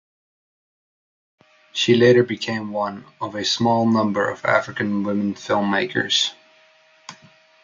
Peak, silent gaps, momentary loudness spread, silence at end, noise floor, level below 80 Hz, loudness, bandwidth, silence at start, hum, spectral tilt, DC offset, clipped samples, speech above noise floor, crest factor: -2 dBFS; none; 11 LU; 0.5 s; -55 dBFS; -66 dBFS; -20 LUFS; 7.6 kHz; 1.75 s; none; -4.5 dB/octave; under 0.1%; under 0.1%; 35 dB; 20 dB